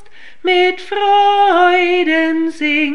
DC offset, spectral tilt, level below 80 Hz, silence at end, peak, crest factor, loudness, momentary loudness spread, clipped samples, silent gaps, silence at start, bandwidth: 2%; -3 dB/octave; -60 dBFS; 0 s; -2 dBFS; 12 dB; -13 LUFS; 6 LU; under 0.1%; none; 0.45 s; 10 kHz